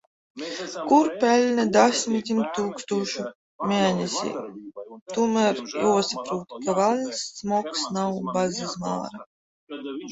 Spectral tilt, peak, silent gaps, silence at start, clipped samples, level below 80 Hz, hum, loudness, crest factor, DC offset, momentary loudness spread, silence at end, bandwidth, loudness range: -4.5 dB/octave; -4 dBFS; 3.35-3.59 s, 5.02-5.06 s, 9.26-9.67 s; 0.35 s; under 0.1%; -66 dBFS; none; -24 LUFS; 20 dB; under 0.1%; 16 LU; 0 s; 8.2 kHz; 4 LU